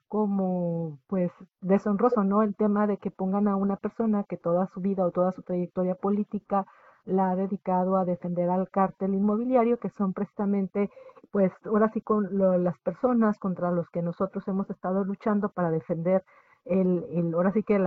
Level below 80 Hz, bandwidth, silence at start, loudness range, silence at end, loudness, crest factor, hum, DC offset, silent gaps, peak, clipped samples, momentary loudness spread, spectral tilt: -64 dBFS; 3 kHz; 0.1 s; 2 LU; 0 s; -27 LUFS; 18 dB; none; under 0.1%; none; -10 dBFS; under 0.1%; 6 LU; -11.5 dB/octave